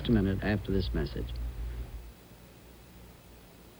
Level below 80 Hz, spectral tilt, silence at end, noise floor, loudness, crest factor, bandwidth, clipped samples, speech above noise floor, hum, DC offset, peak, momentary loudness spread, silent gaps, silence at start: -40 dBFS; -7.5 dB/octave; 0 s; -53 dBFS; -33 LUFS; 20 dB; over 20 kHz; under 0.1%; 24 dB; none; under 0.1%; -14 dBFS; 24 LU; none; 0 s